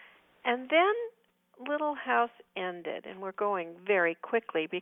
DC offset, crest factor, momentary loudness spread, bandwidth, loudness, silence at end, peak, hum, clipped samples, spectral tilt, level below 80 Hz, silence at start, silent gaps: under 0.1%; 18 dB; 13 LU; 3.9 kHz; -31 LUFS; 0 s; -12 dBFS; none; under 0.1%; -7 dB/octave; -84 dBFS; 0 s; none